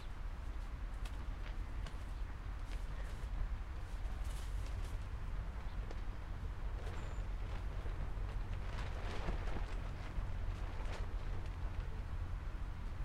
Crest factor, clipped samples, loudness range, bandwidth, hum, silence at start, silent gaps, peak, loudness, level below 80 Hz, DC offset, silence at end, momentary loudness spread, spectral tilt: 16 dB; under 0.1%; 2 LU; 11.5 kHz; none; 0 s; none; -26 dBFS; -46 LUFS; -42 dBFS; under 0.1%; 0 s; 3 LU; -6 dB/octave